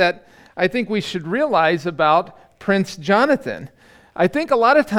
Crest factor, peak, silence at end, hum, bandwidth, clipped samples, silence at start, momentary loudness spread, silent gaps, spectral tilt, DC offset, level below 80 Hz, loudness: 16 dB; -2 dBFS; 0 s; none; 15.5 kHz; under 0.1%; 0 s; 16 LU; none; -5.5 dB/octave; under 0.1%; -58 dBFS; -18 LUFS